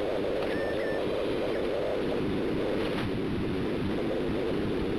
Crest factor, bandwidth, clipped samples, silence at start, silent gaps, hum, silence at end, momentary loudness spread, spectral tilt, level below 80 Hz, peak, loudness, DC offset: 12 dB; 13.5 kHz; under 0.1%; 0 s; none; none; 0 s; 1 LU; -7 dB/octave; -46 dBFS; -18 dBFS; -30 LUFS; under 0.1%